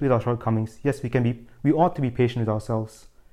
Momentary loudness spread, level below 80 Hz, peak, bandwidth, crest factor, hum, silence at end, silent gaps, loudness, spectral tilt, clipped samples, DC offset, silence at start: 7 LU; -50 dBFS; -8 dBFS; 12 kHz; 16 dB; none; 0.45 s; none; -24 LUFS; -8.5 dB/octave; under 0.1%; under 0.1%; 0 s